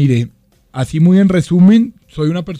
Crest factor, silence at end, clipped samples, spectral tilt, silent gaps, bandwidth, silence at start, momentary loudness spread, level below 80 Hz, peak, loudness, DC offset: 10 dB; 0 s; under 0.1%; -8 dB/octave; none; 10.5 kHz; 0 s; 14 LU; -42 dBFS; -2 dBFS; -12 LUFS; under 0.1%